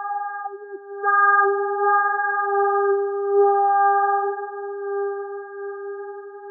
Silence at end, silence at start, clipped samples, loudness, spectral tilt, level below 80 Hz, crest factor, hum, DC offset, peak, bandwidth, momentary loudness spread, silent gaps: 0 s; 0 s; under 0.1%; -20 LUFS; -9 dB/octave; under -90 dBFS; 14 dB; none; under 0.1%; -6 dBFS; 1.8 kHz; 16 LU; none